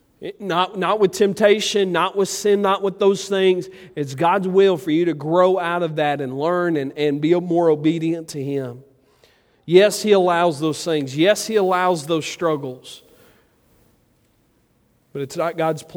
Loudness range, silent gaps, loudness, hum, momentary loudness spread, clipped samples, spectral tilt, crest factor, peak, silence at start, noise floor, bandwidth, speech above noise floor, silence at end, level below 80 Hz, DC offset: 7 LU; none; -19 LUFS; none; 11 LU; under 0.1%; -5 dB/octave; 18 dB; 0 dBFS; 0.2 s; -61 dBFS; 16.5 kHz; 42 dB; 0 s; -66 dBFS; under 0.1%